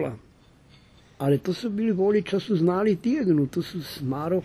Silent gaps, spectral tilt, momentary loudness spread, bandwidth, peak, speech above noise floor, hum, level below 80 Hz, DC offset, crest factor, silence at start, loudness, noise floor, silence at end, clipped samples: none; -7.5 dB/octave; 10 LU; 14 kHz; -10 dBFS; 31 dB; none; -60 dBFS; under 0.1%; 14 dB; 0 s; -25 LUFS; -55 dBFS; 0 s; under 0.1%